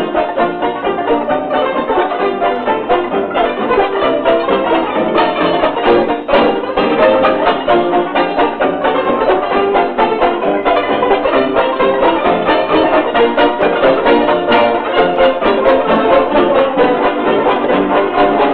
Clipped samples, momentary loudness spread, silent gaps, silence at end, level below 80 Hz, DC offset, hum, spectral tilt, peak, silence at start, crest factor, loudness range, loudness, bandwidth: under 0.1%; 4 LU; none; 0 s; -40 dBFS; 0.2%; none; -8 dB/octave; 0 dBFS; 0 s; 12 dB; 3 LU; -13 LUFS; 5 kHz